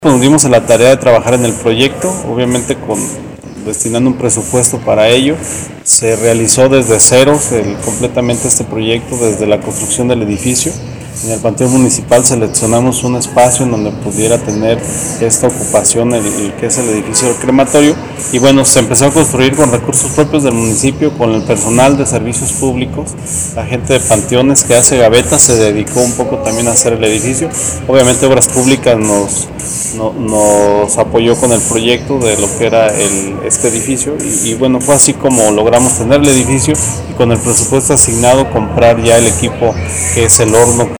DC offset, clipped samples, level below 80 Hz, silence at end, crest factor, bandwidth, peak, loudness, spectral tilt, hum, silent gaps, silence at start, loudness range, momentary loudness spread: under 0.1%; 2%; -34 dBFS; 0 s; 10 dB; over 20 kHz; 0 dBFS; -9 LUFS; -4 dB/octave; none; none; 0 s; 4 LU; 9 LU